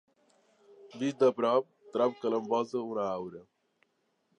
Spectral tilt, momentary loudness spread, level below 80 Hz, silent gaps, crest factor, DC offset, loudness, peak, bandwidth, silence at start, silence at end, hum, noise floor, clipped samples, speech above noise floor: -6 dB/octave; 11 LU; -80 dBFS; none; 18 dB; under 0.1%; -31 LUFS; -14 dBFS; 9.2 kHz; 0.85 s; 0.95 s; none; -76 dBFS; under 0.1%; 46 dB